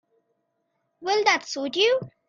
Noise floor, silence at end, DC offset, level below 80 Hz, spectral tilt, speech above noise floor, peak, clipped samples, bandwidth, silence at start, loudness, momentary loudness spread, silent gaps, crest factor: -75 dBFS; 0.2 s; under 0.1%; -76 dBFS; -2.5 dB/octave; 52 dB; -6 dBFS; under 0.1%; 7.6 kHz; 1 s; -23 LUFS; 7 LU; none; 22 dB